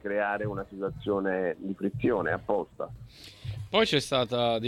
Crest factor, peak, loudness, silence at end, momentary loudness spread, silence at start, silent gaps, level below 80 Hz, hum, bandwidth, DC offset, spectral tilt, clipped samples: 20 dB; -10 dBFS; -29 LUFS; 0 s; 15 LU; 0.05 s; none; -54 dBFS; none; 15.5 kHz; under 0.1%; -5 dB/octave; under 0.1%